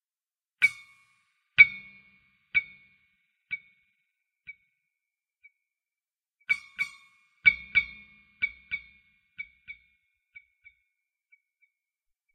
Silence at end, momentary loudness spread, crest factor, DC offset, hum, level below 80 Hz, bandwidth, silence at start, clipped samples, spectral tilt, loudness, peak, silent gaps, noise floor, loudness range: 2.6 s; 29 LU; 30 dB; under 0.1%; none; -66 dBFS; 12.5 kHz; 0.6 s; under 0.1%; -1 dB/octave; -25 LUFS; -4 dBFS; none; under -90 dBFS; 21 LU